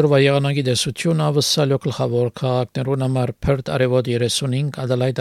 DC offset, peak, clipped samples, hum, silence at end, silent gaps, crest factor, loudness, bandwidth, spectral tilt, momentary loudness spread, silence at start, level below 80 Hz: under 0.1%; -4 dBFS; under 0.1%; none; 0 s; none; 16 dB; -19 LUFS; 14 kHz; -5.5 dB/octave; 5 LU; 0 s; -44 dBFS